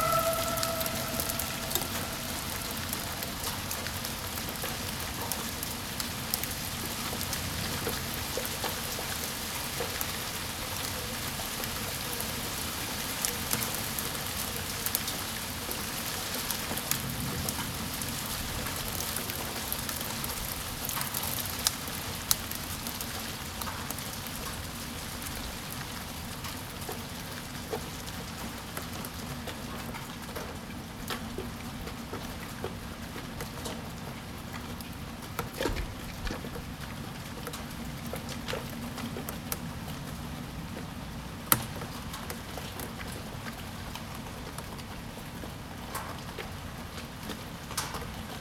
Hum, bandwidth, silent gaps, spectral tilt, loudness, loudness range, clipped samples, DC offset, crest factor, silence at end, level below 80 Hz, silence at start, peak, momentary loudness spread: none; 19.5 kHz; none; -3 dB/octave; -34 LUFS; 7 LU; under 0.1%; under 0.1%; 36 dB; 0 s; -48 dBFS; 0 s; 0 dBFS; 10 LU